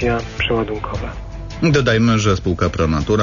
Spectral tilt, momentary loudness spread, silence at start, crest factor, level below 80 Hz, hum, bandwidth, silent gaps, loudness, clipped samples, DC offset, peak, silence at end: -6 dB/octave; 13 LU; 0 s; 14 dB; -30 dBFS; none; 7.4 kHz; none; -18 LUFS; under 0.1%; under 0.1%; -4 dBFS; 0 s